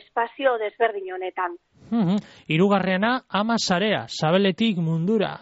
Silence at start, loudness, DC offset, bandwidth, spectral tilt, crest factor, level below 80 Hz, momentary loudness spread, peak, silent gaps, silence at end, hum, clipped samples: 0.15 s; -23 LUFS; under 0.1%; 8 kHz; -4.5 dB/octave; 16 dB; -64 dBFS; 8 LU; -8 dBFS; none; 0.05 s; none; under 0.1%